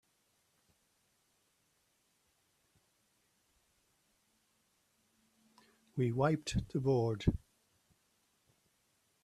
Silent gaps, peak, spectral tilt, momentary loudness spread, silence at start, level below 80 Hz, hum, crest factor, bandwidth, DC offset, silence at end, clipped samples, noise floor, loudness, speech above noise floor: none; -18 dBFS; -7 dB/octave; 8 LU; 5.95 s; -56 dBFS; none; 24 dB; 13 kHz; under 0.1%; 1.85 s; under 0.1%; -77 dBFS; -35 LUFS; 44 dB